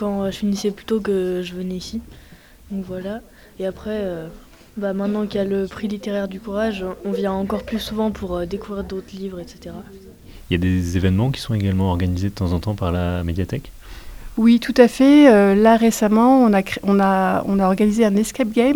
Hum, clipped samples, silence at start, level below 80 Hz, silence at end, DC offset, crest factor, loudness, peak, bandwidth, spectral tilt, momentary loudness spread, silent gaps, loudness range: none; under 0.1%; 0 s; -40 dBFS; 0 s; under 0.1%; 18 dB; -19 LUFS; 0 dBFS; over 20 kHz; -6.5 dB/octave; 17 LU; none; 13 LU